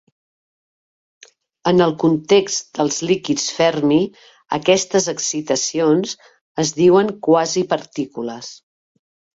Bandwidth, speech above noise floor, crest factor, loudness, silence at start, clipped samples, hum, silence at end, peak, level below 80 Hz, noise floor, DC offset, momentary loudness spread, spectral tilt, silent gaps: 8 kHz; over 73 dB; 16 dB; -18 LUFS; 1.65 s; under 0.1%; none; 0.8 s; -2 dBFS; -60 dBFS; under -90 dBFS; under 0.1%; 12 LU; -4 dB/octave; 6.41-6.55 s